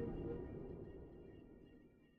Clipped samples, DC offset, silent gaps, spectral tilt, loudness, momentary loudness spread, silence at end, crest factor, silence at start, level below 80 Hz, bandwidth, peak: under 0.1%; under 0.1%; none; -9.5 dB/octave; -52 LUFS; 16 LU; 0 s; 16 dB; 0 s; -60 dBFS; 5 kHz; -34 dBFS